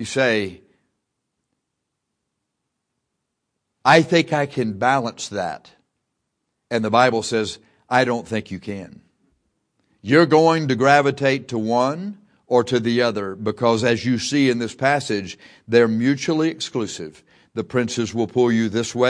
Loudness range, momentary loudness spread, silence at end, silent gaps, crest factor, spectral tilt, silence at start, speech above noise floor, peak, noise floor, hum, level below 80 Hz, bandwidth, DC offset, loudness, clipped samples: 4 LU; 16 LU; 0 s; none; 20 dB; -5 dB/octave; 0 s; 59 dB; 0 dBFS; -78 dBFS; none; -62 dBFS; 10.5 kHz; under 0.1%; -19 LUFS; under 0.1%